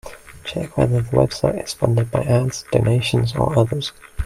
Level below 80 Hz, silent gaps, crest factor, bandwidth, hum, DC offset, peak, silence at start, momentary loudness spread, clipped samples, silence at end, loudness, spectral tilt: -40 dBFS; none; 18 dB; 14 kHz; none; under 0.1%; -2 dBFS; 0.05 s; 10 LU; under 0.1%; 0 s; -20 LUFS; -6.5 dB/octave